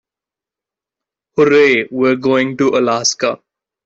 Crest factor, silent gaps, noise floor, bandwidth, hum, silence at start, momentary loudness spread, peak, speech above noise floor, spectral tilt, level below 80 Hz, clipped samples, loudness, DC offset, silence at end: 14 dB; none; -87 dBFS; 8 kHz; none; 1.35 s; 10 LU; -2 dBFS; 74 dB; -3.5 dB/octave; -58 dBFS; under 0.1%; -14 LUFS; under 0.1%; 0.5 s